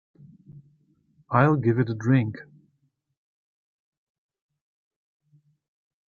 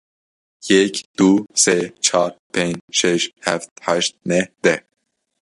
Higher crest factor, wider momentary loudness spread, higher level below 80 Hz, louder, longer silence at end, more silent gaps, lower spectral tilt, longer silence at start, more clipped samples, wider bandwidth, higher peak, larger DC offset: first, 24 dB vs 18 dB; about the same, 10 LU vs 8 LU; second, -66 dBFS vs -60 dBFS; second, -23 LUFS vs -18 LUFS; first, 3.65 s vs 0.65 s; second, none vs 1.05-1.14 s, 2.39-2.50 s, 2.81-2.88 s, 3.71-3.76 s; first, -9.5 dB/octave vs -3 dB/octave; second, 0.5 s vs 0.65 s; neither; second, 7 kHz vs 11.5 kHz; about the same, -4 dBFS vs -2 dBFS; neither